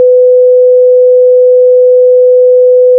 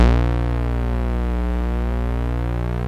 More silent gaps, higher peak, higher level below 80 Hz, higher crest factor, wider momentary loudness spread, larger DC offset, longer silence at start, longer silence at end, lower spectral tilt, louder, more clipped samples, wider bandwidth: neither; about the same, 0 dBFS vs -2 dBFS; second, -88 dBFS vs -20 dBFS; second, 4 dB vs 16 dB; second, 0 LU vs 4 LU; neither; about the same, 0 s vs 0 s; about the same, 0 s vs 0 s; about the same, -7.5 dB/octave vs -8.5 dB/octave; first, -5 LUFS vs -23 LUFS; neither; second, 0.7 kHz vs 6.4 kHz